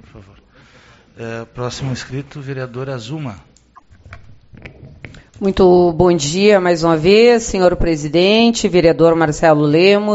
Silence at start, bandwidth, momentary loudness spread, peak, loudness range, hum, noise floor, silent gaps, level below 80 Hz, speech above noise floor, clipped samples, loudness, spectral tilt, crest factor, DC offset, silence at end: 0.15 s; 8.2 kHz; 17 LU; 0 dBFS; 15 LU; none; -47 dBFS; none; -36 dBFS; 33 dB; under 0.1%; -13 LUFS; -5.5 dB/octave; 14 dB; under 0.1%; 0 s